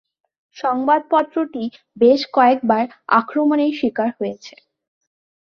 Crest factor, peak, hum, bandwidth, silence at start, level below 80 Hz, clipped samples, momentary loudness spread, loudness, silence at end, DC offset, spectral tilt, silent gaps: 18 dB; -2 dBFS; none; 7 kHz; 0.55 s; -66 dBFS; under 0.1%; 13 LU; -18 LUFS; 1 s; under 0.1%; -6 dB/octave; none